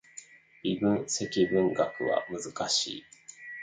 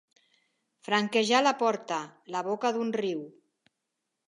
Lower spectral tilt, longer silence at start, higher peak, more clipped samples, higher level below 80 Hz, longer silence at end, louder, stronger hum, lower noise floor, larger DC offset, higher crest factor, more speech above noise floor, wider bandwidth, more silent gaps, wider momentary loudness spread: about the same, -3.5 dB/octave vs -3.5 dB/octave; second, 0.15 s vs 0.85 s; second, -14 dBFS vs -10 dBFS; neither; first, -66 dBFS vs -86 dBFS; second, 0 s vs 1 s; about the same, -29 LUFS vs -28 LUFS; neither; second, -52 dBFS vs -84 dBFS; neither; about the same, 18 dB vs 22 dB; second, 23 dB vs 56 dB; second, 9.6 kHz vs 11.5 kHz; neither; first, 19 LU vs 13 LU